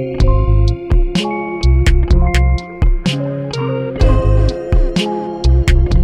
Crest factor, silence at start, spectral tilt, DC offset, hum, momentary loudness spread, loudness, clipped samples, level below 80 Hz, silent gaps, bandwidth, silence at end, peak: 12 dB; 0 s; -6.5 dB/octave; under 0.1%; none; 7 LU; -15 LUFS; under 0.1%; -14 dBFS; none; 10.5 kHz; 0 s; 0 dBFS